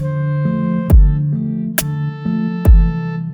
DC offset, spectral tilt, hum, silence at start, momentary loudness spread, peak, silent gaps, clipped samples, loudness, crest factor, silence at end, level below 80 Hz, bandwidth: under 0.1%; -7 dB/octave; none; 0 s; 8 LU; 0 dBFS; none; under 0.1%; -16 LUFS; 14 dB; 0 s; -16 dBFS; over 20 kHz